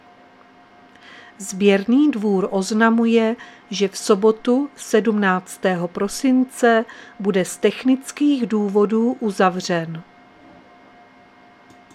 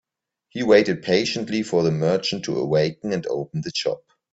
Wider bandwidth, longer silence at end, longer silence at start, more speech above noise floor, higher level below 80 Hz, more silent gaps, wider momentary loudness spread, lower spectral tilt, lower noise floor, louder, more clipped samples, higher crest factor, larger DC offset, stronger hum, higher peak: first, 14.5 kHz vs 8 kHz; first, 1.9 s vs 0.35 s; first, 1.1 s vs 0.55 s; second, 30 dB vs 49 dB; about the same, -64 dBFS vs -60 dBFS; neither; about the same, 8 LU vs 10 LU; about the same, -5 dB/octave vs -5.5 dB/octave; second, -49 dBFS vs -70 dBFS; first, -19 LUFS vs -22 LUFS; neither; about the same, 18 dB vs 20 dB; neither; neither; about the same, 0 dBFS vs -2 dBFS